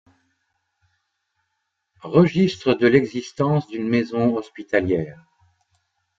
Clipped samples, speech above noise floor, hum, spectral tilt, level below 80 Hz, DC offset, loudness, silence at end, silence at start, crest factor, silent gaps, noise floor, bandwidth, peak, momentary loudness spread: under 0.1%; 56 dB; none; -7.5 dB/octave; -58 dBFS; under 0.1%; -20 LUFS; 1.05 s; 2.05 s; 20 dB; none; -76 dBFS; 7.6 kHz; -2 dBFS; 11 LU